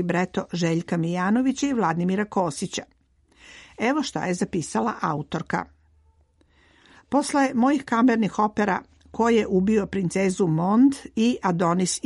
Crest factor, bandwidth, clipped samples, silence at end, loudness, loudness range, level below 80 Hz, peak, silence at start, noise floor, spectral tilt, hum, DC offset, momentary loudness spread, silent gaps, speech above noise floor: 14 dB; 11.5 kHz; under 0.1%; 0.1 s; -23 LUFS; 6 LU; -56 dBFS; -10 dBFS; 0 s; -61 dBFS; -5.5 dB/octave; none; under 0.1%; 8 LU; none; 38 dB